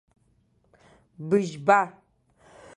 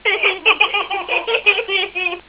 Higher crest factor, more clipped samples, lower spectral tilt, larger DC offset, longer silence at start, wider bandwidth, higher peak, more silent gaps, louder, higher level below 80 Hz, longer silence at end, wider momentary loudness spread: first, 24 dB vs 18 dB; neither; first, -6 dB/octave vs -4.5 dB/octave; neither; first, 1.2 s vs 0.05 s; first, 11 kHz vs 4 kHz; second, -4 dBFS vs 0 dBFS; neither; second, -24 LUFS vs -15 LUFS; second, -68 dBFS vs -56 dBFS; first, 0.85 s vs 0.1 s; first, 13 LU vs 6 LU